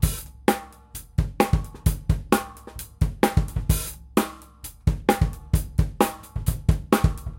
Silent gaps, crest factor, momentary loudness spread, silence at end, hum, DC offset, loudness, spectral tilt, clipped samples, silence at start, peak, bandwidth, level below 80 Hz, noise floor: none; 22 dB; 11 LU; 0 s; none; under 0.1%; -25 LUFS; -6 dB/octave; under 0.1%; 0 s; -2 dBFS; 17 kHz; -30 dBFS; -43 dBFS